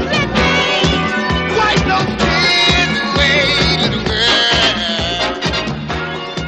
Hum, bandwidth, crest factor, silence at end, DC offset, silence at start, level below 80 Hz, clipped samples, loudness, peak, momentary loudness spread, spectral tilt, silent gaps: none; 10 kHz; 14 dB; 0 s; 0.1%; 0 s; -30 dBFS; under 0.1%; -13 LUFS; 0 dBFS; 7 LU; -4 dB/octave; none